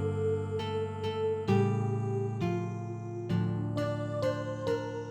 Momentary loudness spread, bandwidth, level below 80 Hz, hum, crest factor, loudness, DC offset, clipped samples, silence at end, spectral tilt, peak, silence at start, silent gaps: 6 LU; 9.2 kHz; -62 dBFS; none; 16 dB; -32 LUFS; under 0.1%; under 0.1%; 0 s; -8 dB/octave; -16 dBFS; 0 s; none